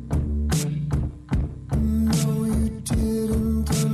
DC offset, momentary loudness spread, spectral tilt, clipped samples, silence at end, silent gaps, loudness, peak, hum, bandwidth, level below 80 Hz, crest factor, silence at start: under 0.1%; 6 LU; -6.5 dB/octave; under 0.1%; 0 s; none; -24 LUFS; -12 dBFS; none; 13.5 kHz; -28 dBFS; 10 dB; 0 s